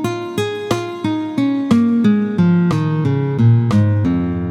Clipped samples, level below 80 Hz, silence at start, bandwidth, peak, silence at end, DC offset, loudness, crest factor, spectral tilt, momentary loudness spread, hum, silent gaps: under 0.1%; -46 dBFS; 0 s; 13.5 kHz; -2 dBFS; 0 s; under 0.1%; -16 LUFS; 14 dB; -8 dB/octave; 8 LU; none; none